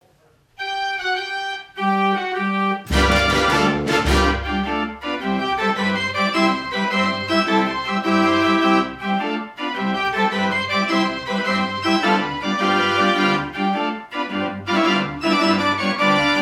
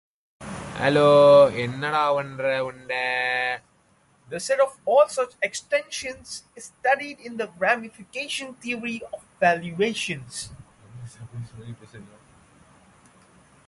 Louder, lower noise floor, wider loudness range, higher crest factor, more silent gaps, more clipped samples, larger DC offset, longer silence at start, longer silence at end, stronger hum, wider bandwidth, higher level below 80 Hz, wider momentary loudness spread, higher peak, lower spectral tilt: first, -19 LUFS vs -23 LUFS; second, -57 dBFS vs -61 dBFS; second, 2 LU vs 12 LU; about the same, 16 dB vs 20 dB; neither; neither; neither; first, 0.6 s vs 0.4 s; second, 0 s vs 1.6 s; neither; first, 15.5 kHz vs 11.5 kHz; first, -36 dBFS vs -60 dBFS; second, 8 LU vs 21 LU; about the same, -4 dBFS vs -6 dBFS; about the same, -5 dB/octave vs -4 dB/octave